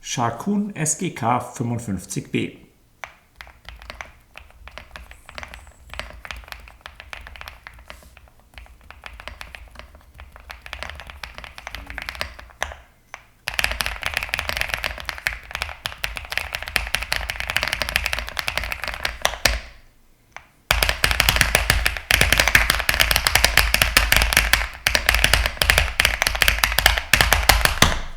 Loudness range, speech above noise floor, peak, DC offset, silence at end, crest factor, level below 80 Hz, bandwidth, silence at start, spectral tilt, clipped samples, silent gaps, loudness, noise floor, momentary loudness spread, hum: 23 LU; 29 dB; 0 dBFS; under 0.1%; 0 s; 24 dB; -32 dBFS; over 20 kHz; 0.05 s; -2 dB/octave; under 0.1%; none; -20 LUFS; -54 dBFS; 23 LU; none